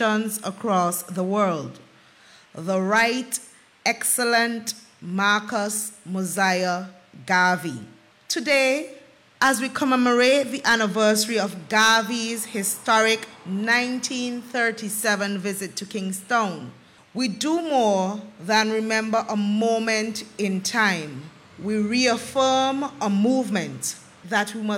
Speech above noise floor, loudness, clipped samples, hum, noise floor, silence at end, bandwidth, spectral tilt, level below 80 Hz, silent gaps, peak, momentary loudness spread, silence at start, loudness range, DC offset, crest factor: 29 dB; -22 LUFS; under 0.1%; none; -52 dBFS; 0 s; 17 kHz; -3 dB/octave; -70 dBFS; none; -8 dBFS; 11 LU; 0 s; 4 LU; under 0.1%; 16 dB